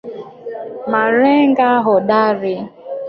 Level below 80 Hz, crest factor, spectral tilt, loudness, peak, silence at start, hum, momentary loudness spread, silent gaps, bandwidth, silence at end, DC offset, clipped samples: -62 dBFS; 14 dB; -8.5 dB/octave; -14 LUFS; -2 dBFS; 0.05 s; none; 17 LU; none; 5.6 kHz; 0 s; under 0.1%; under 0.1%